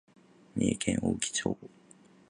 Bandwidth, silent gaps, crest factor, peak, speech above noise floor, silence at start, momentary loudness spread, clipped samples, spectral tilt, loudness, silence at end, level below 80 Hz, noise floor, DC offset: 11 kHz; none; 22 dB; -12 dBFS; 28 dB; 0.55 s; 10 LU; under 0.1%; -4 dB/octave; -32 LUFS; 0.65 s; -56 dBFS; -59 dBFS; under 0.1%